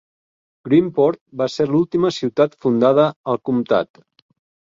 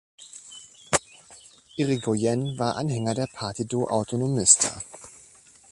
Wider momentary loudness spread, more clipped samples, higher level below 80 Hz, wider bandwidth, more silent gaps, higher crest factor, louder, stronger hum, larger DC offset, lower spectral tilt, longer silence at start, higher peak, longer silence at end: second, 9 LU vs 26 LU; neither; about the same, -60 dBFS vs -58 dBFS; second, 7.6 kHz vs 11.5 kHz; first, 1.21-1.26 s, 3.16-3.24 s vs none; second, 16 dB vs 26 dB; first, -18 LUFS vs -24 LUFS; neither; neither; first, -7 dB/octave vs -4 dB/octave; first, 0.65 s vs 0.2 s; about the same, -2 dBFS vs -2 dBFS; first, 0.85 s vs 0.55 s